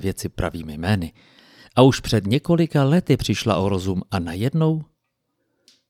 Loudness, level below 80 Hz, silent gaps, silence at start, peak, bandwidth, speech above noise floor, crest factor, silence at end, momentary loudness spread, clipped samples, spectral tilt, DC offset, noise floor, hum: -21 LUFS; -44 dBFS; none; 0 s; -2 dBFS; 16 kHz; 54 dB; 20 dB; 1.05 s; 11 LU; under 0.1%; -6.5 dB/octave; under 0.1%; -74 dBFS; none